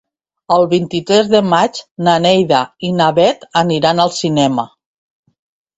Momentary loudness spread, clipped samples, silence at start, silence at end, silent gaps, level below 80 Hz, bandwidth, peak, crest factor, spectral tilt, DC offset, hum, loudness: 6 LU; under 0.1%; 0.5 s; 1.1 s; 1.91-1.95 s; -54 dBFS; 8.2 kHz; 0 dBFS; 14 dB; -5 dB/octave; under 0.1%; none; -13 LUFS